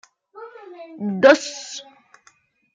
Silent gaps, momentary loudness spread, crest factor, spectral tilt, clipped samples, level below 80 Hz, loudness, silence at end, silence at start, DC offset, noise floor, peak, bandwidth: none; 26 LU; 20 dB; -4 dB/octave; under 0.1%; -72 dBFS; -18 LUFS; 0.95 s; 0.35 s; under 0.1%; -58 dBFS; -2 dBFS; 9.2 kHz